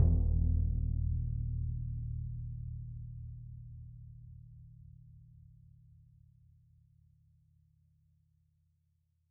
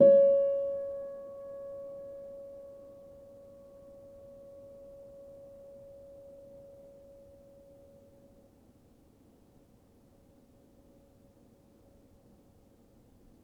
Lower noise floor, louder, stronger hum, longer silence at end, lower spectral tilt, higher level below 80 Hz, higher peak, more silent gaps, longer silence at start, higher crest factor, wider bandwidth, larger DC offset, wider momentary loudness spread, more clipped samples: first, -76 dBFS vs -62 dBFS; second, -37 LUFS vs -30 LUFS; neither; second, 3.8 s vs 10.8 s; first, -15.5 dB/octave vs -9 dB/octave; first, -40 dBFS vs -68 dBFS; second, -16 dBFS vs -10 dBFS; neither; about the same, 0 s vs 0 s; about the same, 22 dB vs 24 dB; second, 1.1 kHz vs 3 kHz; neither; about the same, 25 LU vs 25 LU; neither